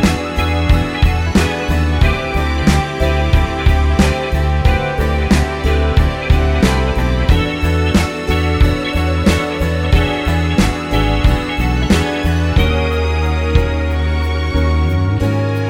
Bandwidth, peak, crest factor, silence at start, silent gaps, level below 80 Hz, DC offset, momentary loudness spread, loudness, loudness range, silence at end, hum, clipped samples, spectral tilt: 16 kHz; 0 dBFS; 14 dB; 0 s; none; -18 dBFS; under 0.1%; 3 LU; -15 LUFS; 1 LU; 0 s; none; under 0.1%; -6 dB/octave